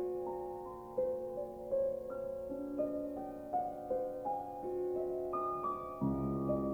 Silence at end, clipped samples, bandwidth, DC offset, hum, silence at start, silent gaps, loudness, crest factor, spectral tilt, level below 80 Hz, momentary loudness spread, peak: 0 s; under 0.1%; over 20 kHz; under 0.1%; none; 0 s; none; -39 LUFS; 14 dB; -10 dB/octave; -60 dBFS; 6 LU; -24 dBFS